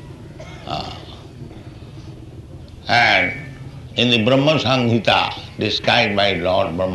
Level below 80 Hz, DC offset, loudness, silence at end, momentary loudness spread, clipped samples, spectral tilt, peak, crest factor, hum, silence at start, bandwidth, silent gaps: -44 dBFS; under 0.1%; -17 LUFS; 0 s; 23 LU; under 0.1%; -5 dB/octave; -2 dBFS; 18 dB; none; 0 s; 12 kHz; none